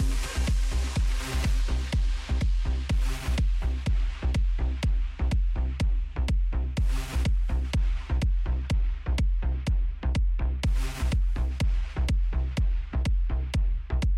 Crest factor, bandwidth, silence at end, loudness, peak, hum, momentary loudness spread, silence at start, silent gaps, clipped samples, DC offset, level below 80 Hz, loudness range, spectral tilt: 8 dB; 12 kHz; 0 s; -29 LUFS; -16 dBFS; none; 2 LU; 0 s; none; under 0.1%; under 0.1%; -26 dBFS; 0 LU; -5.5 dB/octave